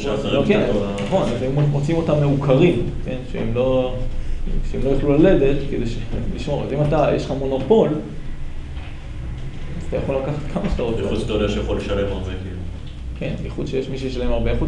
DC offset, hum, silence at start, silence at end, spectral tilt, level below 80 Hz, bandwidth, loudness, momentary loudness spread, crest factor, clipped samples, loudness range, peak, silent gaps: under 0.1%; none; 0 s; 0 s; -7.5 dB/octave; -28 dBFS; 10 kHz; -21 LUFS; 16 LU; 16 dB; under 0.1%; 6 LU; -4 dBFS; none